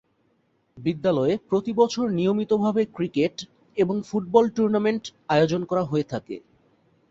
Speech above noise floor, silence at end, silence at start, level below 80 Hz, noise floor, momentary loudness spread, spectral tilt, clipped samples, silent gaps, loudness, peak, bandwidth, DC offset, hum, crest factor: 45 dB; 0.7 s; 0.75 s; -62 dBFS; -67 dBFS; 10 LU; -6.5 dB/octave; under 0.1%; none; -24 LUFS; -4 dBFS; 7.8 kHz; under 0.1%; none; 20 dB